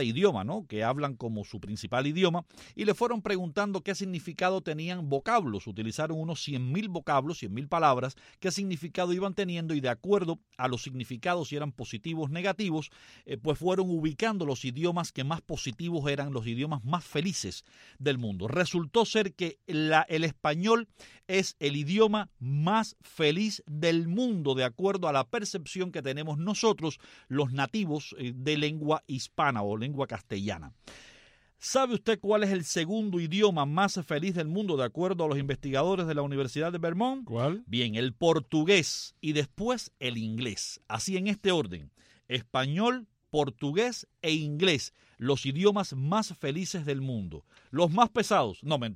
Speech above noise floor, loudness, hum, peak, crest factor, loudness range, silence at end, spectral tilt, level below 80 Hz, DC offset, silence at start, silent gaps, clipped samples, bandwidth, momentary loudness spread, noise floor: 30 dB; -30 LUFS; none; -6 dBFS; 24 dB; 4 LU; 0 s; -5 dB/octave; -62 dBFS; under 0.1%; 0 s; none; under 0.1%; 15.5 kHz; 10 LU; -60 dBFS